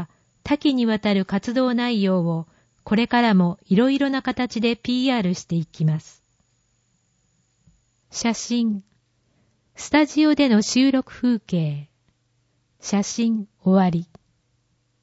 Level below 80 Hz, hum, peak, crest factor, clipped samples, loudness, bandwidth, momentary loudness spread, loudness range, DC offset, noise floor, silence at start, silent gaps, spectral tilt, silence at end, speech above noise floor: -58 dBFS; none; -6 dBFS; 16 dB; under 0.1%; -21 LUFS; 8 kHz; 11 LU; 8 LU; under 0.1%; -67 dBFS; 0 s; none; -5.5 dB/octave; 1 s; 47 dB